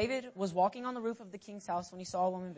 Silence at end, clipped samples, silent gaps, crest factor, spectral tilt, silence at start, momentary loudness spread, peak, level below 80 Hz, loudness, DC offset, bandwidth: 0 s; under 0.1%; none; 18 dB; -5.5 dB/octave; 0 s; 14 LU; -18 dBFS; -64 dBFS; -36 LUFS; under 0.1%; 8 kHz